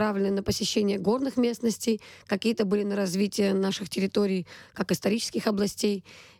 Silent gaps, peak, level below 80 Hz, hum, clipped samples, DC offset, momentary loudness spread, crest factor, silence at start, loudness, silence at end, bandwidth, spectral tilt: none; -12 dBFS; -58 dBFS; none; under 0.1%; under 0.1%; 5 LU; 14 dB; 0 s; -27 LUFS; 0.15 s; 17 kHz; -5 dB/octave